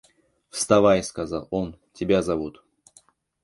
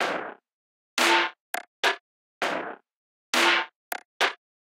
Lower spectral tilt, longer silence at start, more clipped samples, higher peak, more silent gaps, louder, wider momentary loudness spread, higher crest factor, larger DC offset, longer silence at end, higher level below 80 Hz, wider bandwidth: first, -5 dB/octave vs -0.5 dB/octave; first, 0.55 s vs 0 s; neither; first, -2 dBFS vs -8 dBFS; second, none vs 0.53-0.97 s, 1.40-1.54 s, 1.68-1.83 s, 2.00-2.41 s, 2.96-3.33 s, 3.76-3.91 s, 4.05-4.20 s; about the same, -23 LUFS vs -25 LUFS; about the same, 16 LU vs 16 LU; about the same, 22 dB vs 20 dB; neither; first, 0.95 s vs 0.45 s; first, -50 dBFS vs -88 dBFS; second, 11.5 kHz vs 16 kHz